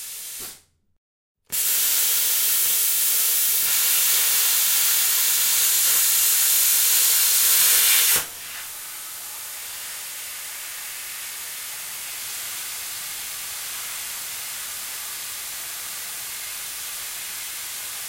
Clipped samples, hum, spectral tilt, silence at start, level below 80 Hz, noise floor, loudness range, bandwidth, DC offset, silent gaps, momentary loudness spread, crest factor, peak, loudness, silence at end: under 0.1%; none; 3.5 dB/octave; 0 s; -66 dBFS; -47 dBFS; 14 LU; 16.5 kHz; under 0.1%; 0.98-1.35 s; 16 LU; 20 dB; -4 dBFS; -19 LUFS; 0 s